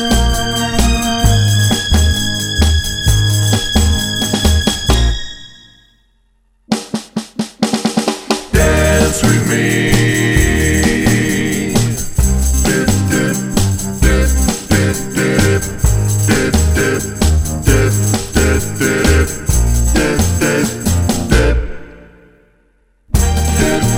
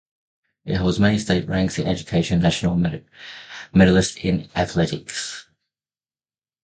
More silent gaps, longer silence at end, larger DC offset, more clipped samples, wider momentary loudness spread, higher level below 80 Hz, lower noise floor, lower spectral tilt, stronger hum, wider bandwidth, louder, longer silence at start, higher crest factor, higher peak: neither; second, 0 s vs 1.25 s; neither; neither; second, 5 LU vs 19 LU; first, -18 dBFS vs -40 dBFS; second, -56 dBFS vs under -90 dBFS; about the same, -4.5 dB/octave vs -5.5 dB/octave; neither; first, 17.5 kHz vs 9.4 kHz; first, -14 LUFS vs -21 LUFS; second, 0 s vs 0.65 s; second, 14 dB vs 20 dB; about the same, 0 dBFS vs 0 dBFS